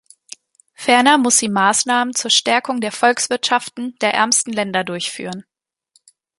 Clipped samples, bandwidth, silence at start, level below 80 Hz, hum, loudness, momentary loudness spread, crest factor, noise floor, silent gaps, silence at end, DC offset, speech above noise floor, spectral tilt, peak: under 0.1%; 12 kHz; 0.8 s; -68 dBFS; none; -16 LUFS; 12 LU; 18 dB; -61 dBFS; none; 0.95 s; under 0.1%; 44 dB; -1.5 dB/octave; 0 dBFS